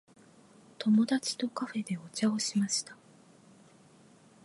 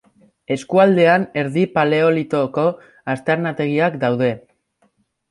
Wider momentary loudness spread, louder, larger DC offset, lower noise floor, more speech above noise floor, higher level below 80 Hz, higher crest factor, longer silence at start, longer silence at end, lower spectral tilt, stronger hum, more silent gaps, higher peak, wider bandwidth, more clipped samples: about the same, 10 LU vs 11 LU; second, -31 LUFS vs -18 LUFS; neither; second, -59 dBFS vs -63 dBFS; second, 29 dB vs 46 dB; second, -82 dBFS vs -62 dBFS; about the same, 16 dB vs 16 dB; first, 0.8 s vs 0.5 s; first, 1.5 s vs 0.95 s; second, -4 dB/octave vs -7 dB/octave; neither; neither; second, -16 dBFS vs -2 dBFS; about the same, 11.5 kHz vs 11.5 kHz; neither